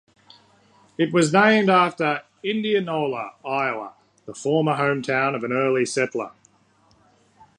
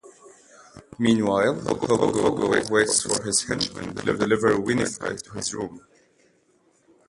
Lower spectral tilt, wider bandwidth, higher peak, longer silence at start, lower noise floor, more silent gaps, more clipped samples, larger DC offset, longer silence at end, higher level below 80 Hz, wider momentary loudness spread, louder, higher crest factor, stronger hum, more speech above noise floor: first, -5 dB/octave vs -3.5 dB/octave; about the same, 11 kHz vs 11.5 kHz; first, -2 dBFS vs -6 dBFS; first, 1 s vs 0.05 s; about the same, -60 dBFS vs -63 dBFS; neither; neither; neither; about the same, 1.25 s vs 1.3 s; second, -70 dBFS vs -54 dBFS; first, 15 LU vs 10 LU; about the same, -21 LUFS vs -23 LUFS; about the same, 20 dB vs 18 dB; neither; about the same, 38 dB vs 40 dB